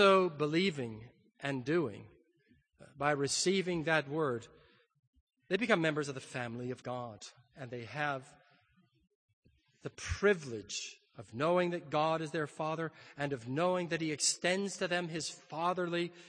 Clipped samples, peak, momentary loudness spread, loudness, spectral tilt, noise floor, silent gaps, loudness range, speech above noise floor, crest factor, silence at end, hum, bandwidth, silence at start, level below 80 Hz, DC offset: under 0.1%; -12 dBFS; 13 LU; -34 LUFS; -4 dB/octave; -71 dBFS; 4.99-5.13 s, 5.20-5.27 s, 9.15-9.42 s; 7 LU; 37 dB; 22 dB; 0 s; none; 9.8 kHz; 0 s; -62 dBFS; under 0.1%